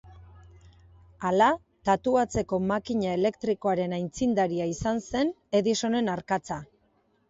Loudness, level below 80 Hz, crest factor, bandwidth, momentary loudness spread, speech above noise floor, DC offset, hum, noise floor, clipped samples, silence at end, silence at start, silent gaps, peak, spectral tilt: -27 LUFS; -54 dBFS; 18 dB; 8 kHz; 7 LU; 42 dB; under 0.1%; none; -68 dBFS; under 0.1%; 0.65 s; 0.05 s; none; -10 dBFS; -5.5 dB/octave